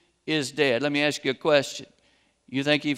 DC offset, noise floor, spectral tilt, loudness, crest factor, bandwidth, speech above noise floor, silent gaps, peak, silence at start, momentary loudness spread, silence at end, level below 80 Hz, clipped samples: under 0.1%; -65 dBFS; -4 dB/octave; -25 LUFS; 20 dB; 15 kHz; 40 dB; none; -6 dBFS; 0.25 s; 10 LU; 0 s; -72 dBFS; under 0.1%